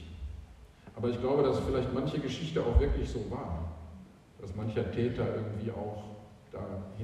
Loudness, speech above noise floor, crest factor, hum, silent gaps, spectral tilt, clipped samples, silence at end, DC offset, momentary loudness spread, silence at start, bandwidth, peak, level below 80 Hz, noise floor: -33 LUFS; 21 dB; 22 dB; none; none; -7.5 dB/octave; under 0.1%; 0 s; under 0.1%; 20 LU; 0 s; 10.5 kHz; -12 dBFS; -40 dBFS; -53 dBFS